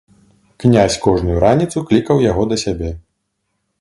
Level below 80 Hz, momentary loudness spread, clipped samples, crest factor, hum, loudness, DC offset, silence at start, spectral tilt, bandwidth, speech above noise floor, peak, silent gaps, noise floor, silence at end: -32 dBFS; 10 LU; under 0.1%; 16 dB; none; -15 LUFS; under 0.1%; 0.6 s; -6 dB/octave; 11.5 kHz; 57 dB; 0 dBFS; none; -71 dBFS; 0.8 s